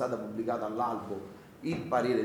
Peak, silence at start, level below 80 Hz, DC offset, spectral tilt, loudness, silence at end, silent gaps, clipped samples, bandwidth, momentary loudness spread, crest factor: -14 dBFS; 0 s; -66 dBFS; under 0.1%; -7 dB/octave; -34 LUFS; 0 s; none; under 0.1%; 19.5 kHz; 11 LU; 18 dB